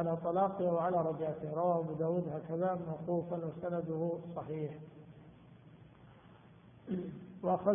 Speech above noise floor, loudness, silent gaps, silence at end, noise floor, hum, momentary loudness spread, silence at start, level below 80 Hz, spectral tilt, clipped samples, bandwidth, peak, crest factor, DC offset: 24 dB; -36 LUFS; none; 0 s; -59 dBFS; none; 14 LU; 0 s; -72 dBFS; -6.5 dB/octave; under 0.1%; 3.6 kHz; -18 dBFS; 18 dB; under 0.1%